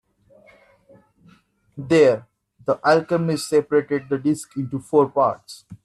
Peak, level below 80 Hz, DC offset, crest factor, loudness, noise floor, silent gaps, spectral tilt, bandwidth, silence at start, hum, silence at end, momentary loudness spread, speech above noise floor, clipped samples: -4 dBFS; -64 dBFS; under 0.1%; 18 dB; -20 LUFS; -56 dBFS; none; -6 dB/octave; 12.5 kHz; 1.75 s; none; 0.1 s; 15 LU; 36 dB; under 0.1%